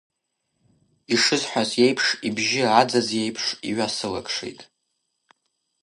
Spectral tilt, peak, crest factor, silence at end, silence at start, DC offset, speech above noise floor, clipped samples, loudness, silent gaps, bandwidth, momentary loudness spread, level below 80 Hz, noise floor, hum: -3 dB/octave; -2 dBFS; 22 dB; 1.2 s; 1.1 s; under 0.1%; 54 dB; under 0.1%; -22 LUFS; none; 11.5 kHz; 9 LU; -64 dBFS; -77 dBFS; none